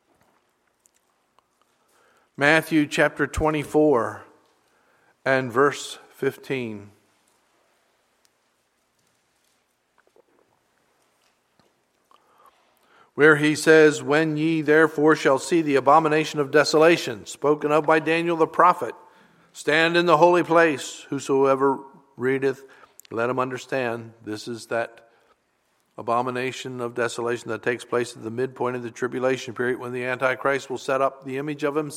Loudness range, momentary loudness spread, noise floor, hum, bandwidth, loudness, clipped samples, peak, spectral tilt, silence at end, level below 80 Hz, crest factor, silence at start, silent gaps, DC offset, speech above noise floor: 10 LU; 14 LU; -69 dBFS; none; 15 kHz; -22 LUFS; under 0.1%; 0 dBFS; -5 dB/octave; 0 s; -54 dBFS; 22 dB; 2.4 s; none; under 0.1%; 48 dB